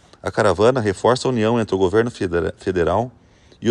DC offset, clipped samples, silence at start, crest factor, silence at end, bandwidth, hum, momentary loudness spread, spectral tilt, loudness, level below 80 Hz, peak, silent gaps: under 0.1%; under 0.1%; 0.25 s; 16 dB; 0 s; 10.5 kHz; none; 7 LU; -6 dB/octave; -19 LUFS; -46 dBFS; -2 dBFS; none